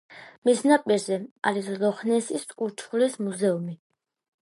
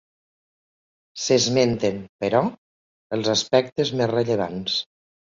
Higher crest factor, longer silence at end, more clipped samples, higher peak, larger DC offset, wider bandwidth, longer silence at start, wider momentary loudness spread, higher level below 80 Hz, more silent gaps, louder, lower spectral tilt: about the same, 20 dB vs 20 dB; first, 0.7 s vs 0.55 s; neither; about the same, -6 dBFS vs -4 dBFS; neither; first, 11.5 kHz vs 7.8 kHz; second, 0.1 s vs 1.15 s; about the same, 11 LU vs 10 LU; second, -80 dBFS vs -58 dBFS; second, 0.38-0.42 s, 1.31-1.36 s vs 2.09-2.19 s, 2.58-3.10 s; second, -25 LUFS vs -22 LUFS; about the same, -5 dB/octave vs -4 dB/octave